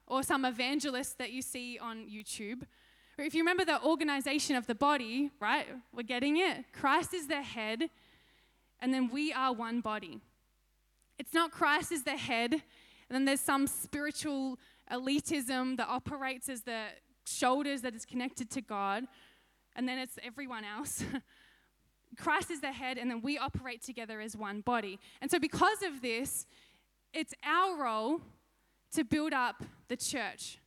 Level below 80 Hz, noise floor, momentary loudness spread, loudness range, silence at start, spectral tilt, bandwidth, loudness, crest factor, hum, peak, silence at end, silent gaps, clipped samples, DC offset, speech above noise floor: -68 dBFS; -74 dBFS; 13 LU; 6 LU; 0.1 s; -3 dB/octave; 16.5 kHz; -34 LUFS; 20 dB; none; -14 dBFS; 0.1 s; none; under 0.1%; under 0.1%; 39 dB